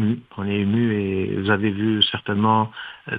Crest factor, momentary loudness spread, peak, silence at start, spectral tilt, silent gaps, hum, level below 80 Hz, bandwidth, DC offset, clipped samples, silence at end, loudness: 20 dB; 8 LU; -2 dBFS; 0 s; -9 dB/octave; none; none; -62 dBFS; 5 kHz; under 0.1%; under 0.1%; 0 s; -21 LUFS